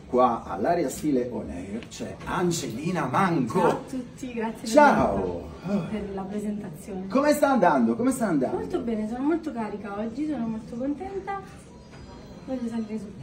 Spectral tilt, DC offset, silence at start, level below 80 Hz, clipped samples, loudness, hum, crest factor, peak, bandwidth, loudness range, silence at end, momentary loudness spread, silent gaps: -6 dB/octave; under 0.1%; 0 s; -50 dBFS; under 0.1%; -26 LUFS; none; 22 dB; -4 dBFS; 16 kHz; 7 LU; 0 s; 15 LU; none